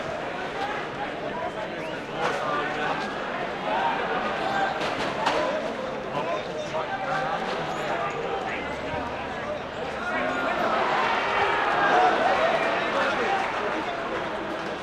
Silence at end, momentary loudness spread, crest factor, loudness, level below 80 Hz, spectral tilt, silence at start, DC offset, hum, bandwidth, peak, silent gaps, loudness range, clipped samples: 0 s; 9 LU; 18 dB; -26 LUFS; -54 dBFS; -4.5 dB/octave; 0 s; under 0.1%; none; 13.5 kHz; -8 dBFS; none; 6 LU; under 0.1%